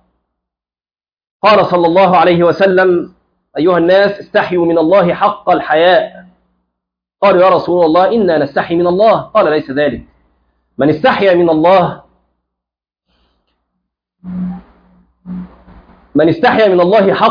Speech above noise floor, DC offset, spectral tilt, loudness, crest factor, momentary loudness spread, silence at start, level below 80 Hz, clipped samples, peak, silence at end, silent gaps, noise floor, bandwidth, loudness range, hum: over 80 dB; under 0.1%; -8 dB/octave; -11 LUFS; 12 dB; 15 LU; 1.45 s; -48 dBFS; under 0.1%; 0 dBFS; 0 s; none; under -90 dBFS; 5.2 kHz; 13 LU; none